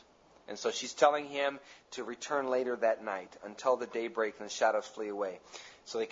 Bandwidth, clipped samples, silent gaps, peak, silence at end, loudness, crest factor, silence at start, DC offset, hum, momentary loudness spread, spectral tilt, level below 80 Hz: 8 kHz; under 0.1%; none; -12 dBFS; 0 s; -33 LUFS; 22 dB; 0.5 s; under 0.1%; none; 19 LU; -2.5 dB/octave; -80 dBFS